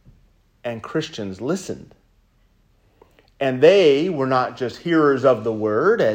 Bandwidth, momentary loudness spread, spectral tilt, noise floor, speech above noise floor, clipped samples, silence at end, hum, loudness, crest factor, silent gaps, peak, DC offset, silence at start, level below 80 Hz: 15 kHz; 16 LU; -6 dB/octave; -59 dBFS; 40 dB; under 0.1%; 0 s; none; -19 LUFS; 20 dB; none; 0 dBFS; under 0.1%; 0.65 s; -60 dBFS